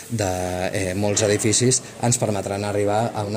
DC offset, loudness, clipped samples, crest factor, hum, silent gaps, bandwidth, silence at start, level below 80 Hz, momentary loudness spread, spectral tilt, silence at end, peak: under 0.1%; -21 LUFS; under 0.1%; 16 dB; none; none; 16 kHz; 0 s; -54 dBFS; 7 LU; -4 dB/octave; 0 s; -6 dBFS